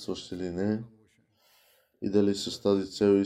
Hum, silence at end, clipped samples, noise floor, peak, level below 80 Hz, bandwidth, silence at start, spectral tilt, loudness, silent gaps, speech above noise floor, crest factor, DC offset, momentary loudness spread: none; 0 s; under 0.1%; -66 dBFS; -12 dBFS; -66 dBFS; 13.5 kHz; 0 s; -6 dB/octave; -29 LUFS; none; 39 dB; 16 dB; under 0.1%; 11 LU